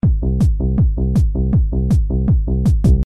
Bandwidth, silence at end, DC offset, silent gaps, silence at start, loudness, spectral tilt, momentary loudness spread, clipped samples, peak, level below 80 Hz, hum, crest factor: 8.4 kHz; 0 s; 0.7%; none; 0.05 s; -17 LUFS; -10 dB/octave; 1 LU; under 0.1%; -4 dBFS; -16 dBFS; none; 12 dB